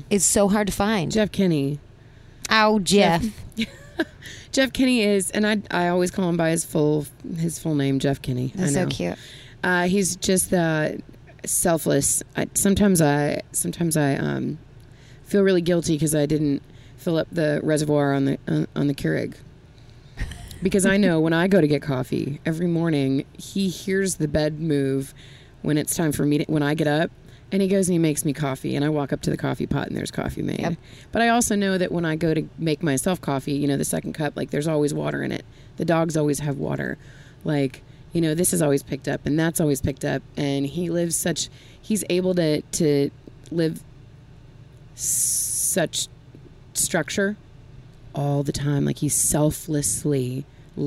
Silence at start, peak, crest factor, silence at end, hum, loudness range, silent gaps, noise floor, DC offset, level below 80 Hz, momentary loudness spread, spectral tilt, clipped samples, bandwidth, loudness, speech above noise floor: 0 s; -4 dBFS; 20 dB; 0 s; none; 3 LU; none; -47 dBFS; under 0.1%; -46 dBFS; 11 LU; -4.5 dB/octave; under 0.1%; 16 kHz; -23 LUFS; 25 dB